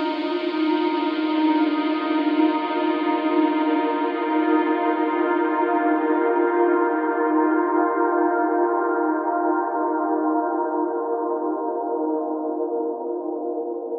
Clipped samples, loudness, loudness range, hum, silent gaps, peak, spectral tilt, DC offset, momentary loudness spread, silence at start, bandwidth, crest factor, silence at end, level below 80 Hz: under 0.1%; -22 LUFS; 4 LU; none; none; -8 dBFS; -6.5 dB/octave; under 0.1%; 6 LU; 0 s; 5.2 kHz; 14 dB; 0 s; under -90 dBFS